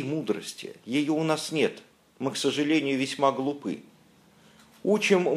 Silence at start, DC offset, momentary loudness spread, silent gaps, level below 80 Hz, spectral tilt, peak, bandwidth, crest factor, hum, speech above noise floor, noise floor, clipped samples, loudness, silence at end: 0 s; under 0.1%; 12 LU; none; -76 dBFS; -4.5 dB/octave; -8 dBFS; 14.5 kHz; 20 dB; none; 32 dB; -58 dBFS; under 0.1%; -27 LUFS; 0 s